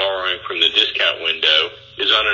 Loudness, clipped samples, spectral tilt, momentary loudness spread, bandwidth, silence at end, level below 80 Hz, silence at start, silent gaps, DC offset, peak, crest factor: -16 LUFS; under 0.1%; -1.5 dB/octave; 8 LU; 7.4 kHz; 0 s; -54 dBFS; 0 s; none; under 0.1%; -2 dBFS; 16 dB